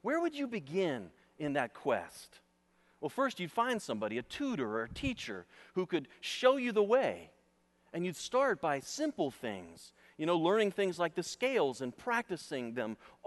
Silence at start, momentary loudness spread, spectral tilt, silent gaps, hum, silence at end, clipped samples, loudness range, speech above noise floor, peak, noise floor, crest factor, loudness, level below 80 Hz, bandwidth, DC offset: 0.05 s; 13 LU; -4.5 dB/octave; none; none; 0.2 s; under 0.1%; 4 LU; 37 dB; -14 dBFS; -72 dBFS; 20 dB; -35 LUFS; -66 dBFS; 12 kHz; under 0.1%